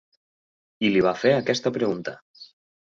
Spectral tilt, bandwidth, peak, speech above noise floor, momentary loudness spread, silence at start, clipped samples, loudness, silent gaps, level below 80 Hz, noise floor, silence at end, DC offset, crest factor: -5.5 dB/octave; 7.6 kHz; -8 dBFS; over 68 dB; 13 LU; 0.8 s; under 0.1%; -23 LUFS; 2.22-2.34 s; -62 dBFS; under -90 dBFS; 0.45 s; under 0.1%; 18 dB